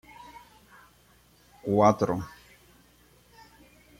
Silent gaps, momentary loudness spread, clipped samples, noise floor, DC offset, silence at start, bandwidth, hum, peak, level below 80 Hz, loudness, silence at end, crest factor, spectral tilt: none; 26 LU; under 0.1%; -60 dBFS; under 0.1%; 0.2 s; 16.5 kHz; 60 Hz at -60 dBFS; -8 dBFS; -60 dBFS; -25 LUFS; 1.7 s; 24 dB; -7 dB/octave